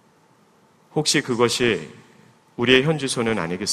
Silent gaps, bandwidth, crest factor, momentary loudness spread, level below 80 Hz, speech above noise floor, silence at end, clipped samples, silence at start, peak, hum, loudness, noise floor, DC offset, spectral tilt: none; 15 kHz; 22 dB; 11 LU; -54 dBFS; 37 dB; 0 s; under 0.1%; 0.95 s; 0 dBFS; none; -20 LUFS; -57 dBFS; under 0.1%; -3.5 dB/octave